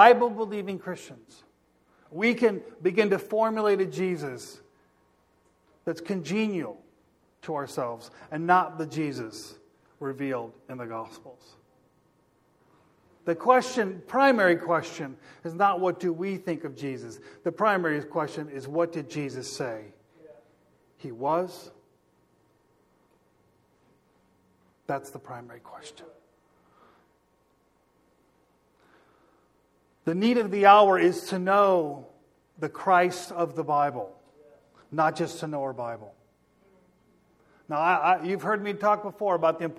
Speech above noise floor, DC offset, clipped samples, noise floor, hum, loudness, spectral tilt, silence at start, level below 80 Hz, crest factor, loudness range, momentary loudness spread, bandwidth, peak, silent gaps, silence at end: 41 dB; under 0.1%; under 0.1%; -67 dBFS; none; -26 LUFS; -5.5 dB/octave; 0 s; -74 dBFS; 26 dB; 17 LU; 19 LU; 14.5 kHz; -2 dBFS; none; 0.05 s